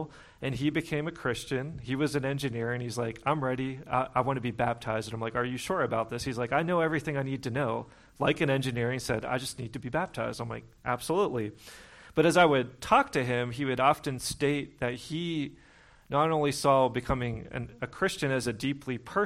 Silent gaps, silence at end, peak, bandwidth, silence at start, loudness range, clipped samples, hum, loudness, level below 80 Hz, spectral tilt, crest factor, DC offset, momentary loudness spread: none; 0 s; -8 dBFS; 16 kHz; 0 s; 5 LU; under 0.1%; none; -30 LUFS; -54 dBFS; -5.5 dB/octave; 22 dB; under 0.1%; 11 LU